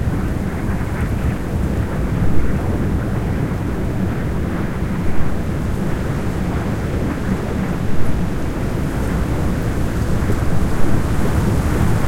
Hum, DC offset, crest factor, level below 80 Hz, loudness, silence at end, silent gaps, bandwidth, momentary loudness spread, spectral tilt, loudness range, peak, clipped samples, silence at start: none; under 0.1%; 14 dB; -24 dBFS; -21 LUFS; 0 s; none; 16.5 kHz; 3 LU; -7.5 dB/octave; 2 LU; -2 dBFS; under 0.1%; 0 s